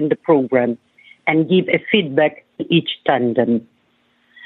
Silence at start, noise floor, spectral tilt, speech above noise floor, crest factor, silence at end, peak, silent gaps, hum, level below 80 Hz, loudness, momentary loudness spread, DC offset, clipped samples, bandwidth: 0 s; -61 dBFS; -9 dB/octave; 44 dB; 16 dB; 0.85 s; -2 dBFS; none; none; -66 dBFS; -17 LUFS; 8 LU; under 0.1%; under 0.1%; 4.2 kHz